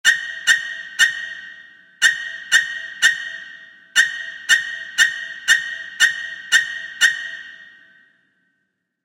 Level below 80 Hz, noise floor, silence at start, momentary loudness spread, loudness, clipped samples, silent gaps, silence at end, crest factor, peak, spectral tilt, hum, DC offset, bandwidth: -74 dBFS; -73 dBFS; 0.05 s; 14 LU; -18 LUFS; under 0.1%; none; 1.35 s; 22 dB; 0 dBFS; 3.5 dB/octave; none; under 0.1%; 16 kHz